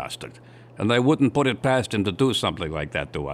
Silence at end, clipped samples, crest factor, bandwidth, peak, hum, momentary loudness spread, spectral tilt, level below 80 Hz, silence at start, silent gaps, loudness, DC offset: 0 s; under 0.1%; 16 dB; 14.5 kHz; -8 dBFS; none; 11 LU; -5.5 dB/octave; -48 dBFS; 0 s; none; -23 LUFS; under 0.1%